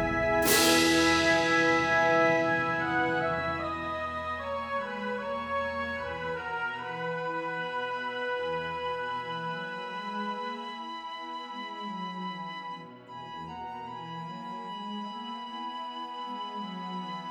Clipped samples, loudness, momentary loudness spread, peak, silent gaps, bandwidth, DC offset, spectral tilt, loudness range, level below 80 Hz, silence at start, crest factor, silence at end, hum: under 0.1%; -30 LUFS; 16 LU; -12 dBFS; none; over 20 kHz; under 0.1%; -3 dB/octave; 14 LU; -56 dBFS; 0 s; 20 dB; 0 s; none